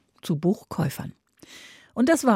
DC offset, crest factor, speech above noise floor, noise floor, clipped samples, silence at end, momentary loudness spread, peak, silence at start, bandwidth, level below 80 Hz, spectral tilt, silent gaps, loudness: under 0.1%; 18 dB; 26 dB; -49 dBFS; under 0.1%; 0 s; 23 LU; -8 dBFS; 0.25 s; 16 kHz; -62 dBFS; -6 dB/octave; none; -26 LUFS